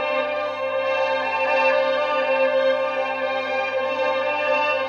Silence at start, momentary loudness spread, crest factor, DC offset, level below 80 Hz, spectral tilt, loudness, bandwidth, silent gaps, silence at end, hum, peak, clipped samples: 0 s; 5 LU; 14 dB; under 0.1%; -78 dBFS; -3.5 dB/octave; -21 LUFS; 6.8 kHz; none; 0 s; none; -8 dBFS; under 0.1%